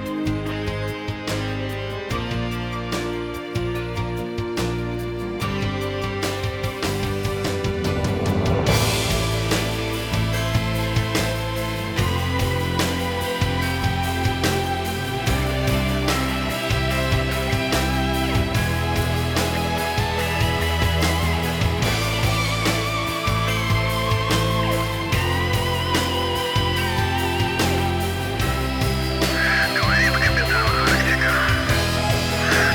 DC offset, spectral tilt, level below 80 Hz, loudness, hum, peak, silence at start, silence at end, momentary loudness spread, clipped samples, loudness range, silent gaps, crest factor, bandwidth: under 0.1%; -4.5 dB/octave; -32 dBFS; -22 LUFS; none; -4 dBFS; 0 s; 0 s; 8 LU; under 0.1%; 7 LU; none; 16 dB; over 20 kHz